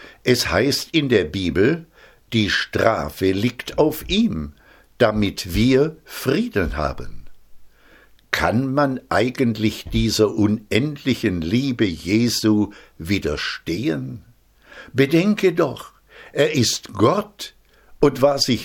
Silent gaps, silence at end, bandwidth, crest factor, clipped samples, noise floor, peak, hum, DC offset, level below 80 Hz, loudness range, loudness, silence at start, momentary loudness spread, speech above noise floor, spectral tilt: none; 0 s; 17.5 kHz; 20 dB; under 0.1%; -51 dBFS; 0 dBFS; none; under 0.1%; -40 dBFS; 3 LU; -20 LUFS; 0 s; 10 LU; 31 dB; -5 dB/octave